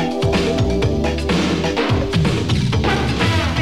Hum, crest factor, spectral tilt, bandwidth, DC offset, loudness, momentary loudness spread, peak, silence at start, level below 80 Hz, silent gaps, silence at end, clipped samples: none; 12 dB; -6 dB/octave; 14.5 kHz; 1%; -18 LUFS; 1 LU; -4 dBFS; 0 s; -28 dBFS; none; 0 s; under 0.1%